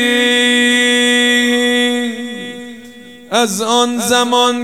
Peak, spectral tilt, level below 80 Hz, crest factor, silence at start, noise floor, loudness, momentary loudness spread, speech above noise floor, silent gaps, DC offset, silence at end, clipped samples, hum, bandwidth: 0 dBFS; -1.5 dB/octave; -62 dBFS; 14 dB; 0 s; -36 dBFS; -12 LUFS; 15 LU; 23 dB; none; 0.4%; 0 s; under 0.1%; none; 16 kHz